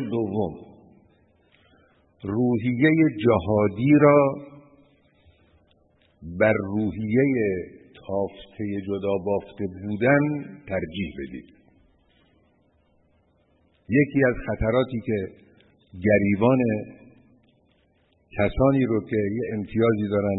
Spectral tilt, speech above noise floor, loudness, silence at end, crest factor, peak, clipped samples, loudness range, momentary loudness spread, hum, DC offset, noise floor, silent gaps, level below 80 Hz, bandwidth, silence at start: -12 dB/octave; 42 dB; -23 LUFS; 0 s; 20 dB; -6 dBFS; under 0.1%; 7 LU; 15 LU; none; under 0.1%; -64 dBFS; none; -48 dBFS; 4.1 kHz; 0 s